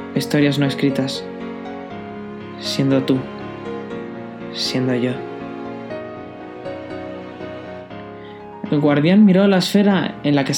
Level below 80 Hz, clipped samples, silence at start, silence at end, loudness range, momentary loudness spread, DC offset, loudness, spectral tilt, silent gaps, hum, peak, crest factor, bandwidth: -58 dBFS; under 0.1%; 0 s; 0 s; 11 LU; 18 LU; under 0.1%; -19 LUFS; -6 dB/octave; none; none; -2 dBFS; 18 dB; 17 kHz